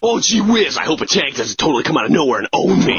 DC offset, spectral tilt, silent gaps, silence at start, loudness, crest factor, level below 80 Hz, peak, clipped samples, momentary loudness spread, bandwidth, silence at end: under 0.1%; -3.5 dB/octave; none; 0 s; -15 LUFS; 14 dB; -48 dBFS; 0 dBFS; under 0.1%; 4 LU; 7.4 kHz; 0 s